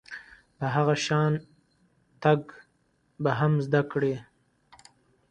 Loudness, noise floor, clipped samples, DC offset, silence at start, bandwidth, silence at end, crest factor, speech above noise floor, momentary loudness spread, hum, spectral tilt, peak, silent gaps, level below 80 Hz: -27 LUFS; -69 dBFS; under 0.1%; under 0.1%; 0.1 s; 9.4 kHz; 1.1 s; 22 dB; 44 dB; 13 LU; none; -6.5 dB/octave; -6 dBFS; none; -64 dBFS